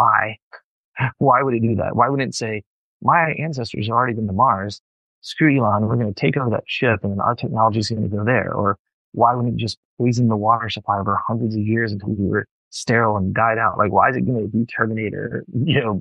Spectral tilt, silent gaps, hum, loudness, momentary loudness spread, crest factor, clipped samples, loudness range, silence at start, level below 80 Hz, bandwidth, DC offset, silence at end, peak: -6.5 dB/octave; 0.42-0.51 s, 0.64-0.93 s, 2.66-3.00 s, 4.80-5.22 s, 8.79-8.85 s, 8.93-9.12 s, 9.77-9.97 s, 12.51-12.71 s; none; -20 LUFS; 9 LU; 18 dB; under 0.1%; 1 LU; 0 s; -54 dBFS; 10 kHz; under 0.1%; 0 s; -2 dBFS